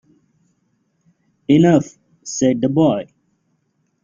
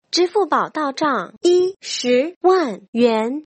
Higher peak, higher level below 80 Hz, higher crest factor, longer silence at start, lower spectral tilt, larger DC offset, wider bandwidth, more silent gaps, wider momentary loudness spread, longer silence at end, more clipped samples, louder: about the same, -2 dBFS vs -4 dBFS; first, -56 dBFS vs -68 dBFS; about the same, 18 dB vs 14 dB; first, 1.5 s vs 0.15 s; first, -6.5 dB/octave vs -3.5 dB/octave; neither; second, 7.6 kHz vs 8.6 kHz; second, none vs 2.36-2.41 s, 2.88-2.93 s; first, 21 LU vs 5 LU; first, 1 s vs 0.05 s; neither; about the same, -16 LUFS vs -18 LUFS